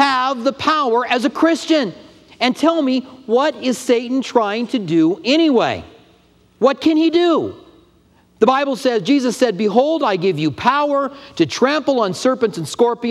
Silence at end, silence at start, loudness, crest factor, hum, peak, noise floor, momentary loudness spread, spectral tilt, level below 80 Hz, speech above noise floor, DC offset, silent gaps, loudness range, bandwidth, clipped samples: 0 s; 0 s; -17 LUFS; 16 dB; none; 0 dBFS; -53 dBFS; 5 LU; -5 dB/octave; -60 dBFS; 37 dB; under 0.1%; none; 1 LU; 13 kHz; under 0.1%